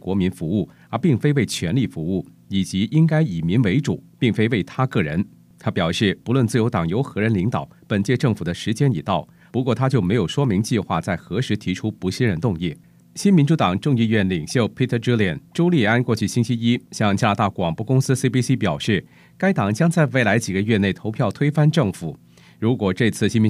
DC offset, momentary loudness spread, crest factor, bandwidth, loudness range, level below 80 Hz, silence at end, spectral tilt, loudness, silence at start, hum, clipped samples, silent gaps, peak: under 0.1%; 7 LU; 18 dB; 14 kHz; 2 LU; -52 dBFS; 0 s; -6.5 dB/octave; -21 LUFS; 0.05 s; none; under 0.1%; none; -2 dBFS